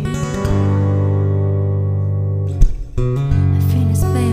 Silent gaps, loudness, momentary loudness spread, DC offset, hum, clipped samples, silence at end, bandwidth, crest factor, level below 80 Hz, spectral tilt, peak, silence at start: none; -17 LUFS; 5 LU; under 0.1%; 50 Hz at -35 dBFS; under 0.1%; 0 s; 15.5 kHz; 14 dB; -24 dBFS; -8 dB/octave; 0 dBFS; 0 s